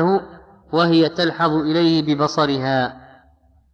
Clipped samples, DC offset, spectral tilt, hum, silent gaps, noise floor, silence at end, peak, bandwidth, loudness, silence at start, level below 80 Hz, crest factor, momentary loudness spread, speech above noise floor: under 0.1%; under 0.1%; -6.5 dB/octave; none; none; -55 dBFS; 0.75 s; -6 dBFS; 7 kHz; -18 LUFS; 0 s; -54 dBFS; 14 dB; 6 LU; 37 dB